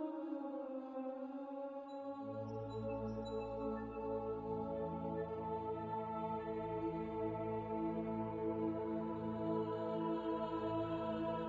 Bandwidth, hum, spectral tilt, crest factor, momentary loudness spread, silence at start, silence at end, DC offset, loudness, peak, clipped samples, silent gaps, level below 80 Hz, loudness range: 7.6 kHz; none; -9 dB/octave; 14 dB; 6 LU; 0 s; 0 s; under 0.1%; -43 LUFS; -28 dBFS; under 0.1%; none; -64 dBFS; 4 LU